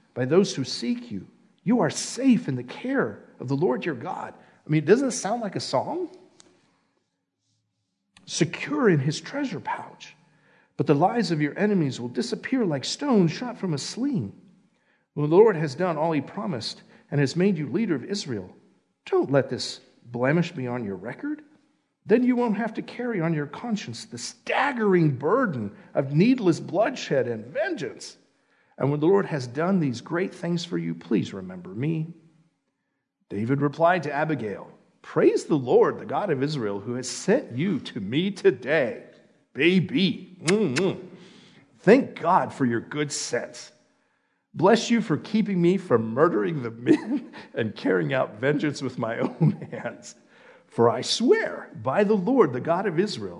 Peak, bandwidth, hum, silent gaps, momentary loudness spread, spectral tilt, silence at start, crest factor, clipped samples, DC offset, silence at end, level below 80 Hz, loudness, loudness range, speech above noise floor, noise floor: -4 dBFS; 11 kHz; none; none; 13 LU; -6 dB/octave; 0.15 s; 22 dB; under 0.1%; under 0.1%; 0 s; -76 dBFS; -25 LUFS; 4 LU; 54 dB; -78 dBFS